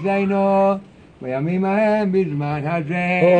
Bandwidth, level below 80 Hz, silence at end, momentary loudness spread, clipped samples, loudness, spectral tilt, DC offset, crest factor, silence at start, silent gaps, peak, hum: 8.6 kHz; -56 dBFS; 0 s; 8 LU; under 0.1%; -19 LUFS; -8.5 dB/octave; under 0.1%; 16 dB; 0 s; none; -4 dBFS; none